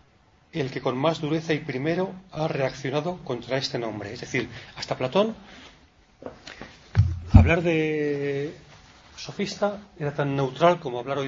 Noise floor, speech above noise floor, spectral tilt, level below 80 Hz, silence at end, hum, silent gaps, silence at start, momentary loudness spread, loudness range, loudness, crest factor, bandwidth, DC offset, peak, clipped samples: -59 dBFS; 34 dB; -6.5 dB/octave; -38 dBFS; 0 s; none; none; 0.55 s; 18 LU; 5 LU; -26 LUFS; 24 dB; 7.6 kHz; under 0.1%; 0 dBFS; under 0.1%